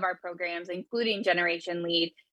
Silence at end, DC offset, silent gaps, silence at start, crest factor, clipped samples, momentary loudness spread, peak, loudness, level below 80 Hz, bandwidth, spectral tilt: 0.25 s; under 0.1%; none; 0 s; 18 dB; under 0.1%; 8 LU; -12 dBFS; -29 LUFS; -84 dBFS; 9.6 kHz; -4.5 dB/octave